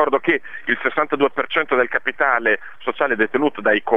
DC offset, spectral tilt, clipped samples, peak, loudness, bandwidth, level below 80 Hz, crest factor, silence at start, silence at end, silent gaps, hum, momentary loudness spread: 2%; -6.5 dB/octave; under 0.1%; -2 dBFS; -19 LUFS; 4 kHz; -64 dBFS; 18 dB; 0 s; 0 s; none; none; 5 LU